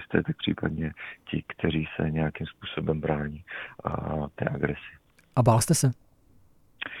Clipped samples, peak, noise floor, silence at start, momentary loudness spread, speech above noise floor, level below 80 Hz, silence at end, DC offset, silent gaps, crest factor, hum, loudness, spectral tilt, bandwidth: under 0.1%; -6 dBFS; -58 dBFS; 0 s; 16 LU; 31 dB; -48 dBFS; 0 s; under 0.1%; none; 22 dB; none; -29 LUFS; -5.5 dB/octave; 15 kHz